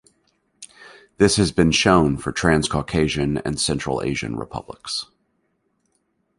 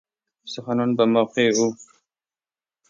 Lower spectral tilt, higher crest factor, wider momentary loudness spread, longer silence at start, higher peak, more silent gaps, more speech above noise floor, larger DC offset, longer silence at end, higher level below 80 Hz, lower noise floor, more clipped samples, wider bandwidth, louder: about the same, -4.5 dB/octave vs -4.5 dB/octave; about the same, 20 dB vs 18 dB; about the same, 16 LU vs 16 LU; first, 0.6 s vs 0.45 s; first, -2 dBFS vs -6 dBFS; neither; second, 49 dB vs over 69 dB; neither; first, 1.35 s vs 1.05 s; first, -40 dBFS vs -72 dBFS; second, -69 dBFS vs under -90 dBFS; neither; first, 11.5 kHz vs 7.6 kHz; about the same, -20 LUFS vs -21 LUFS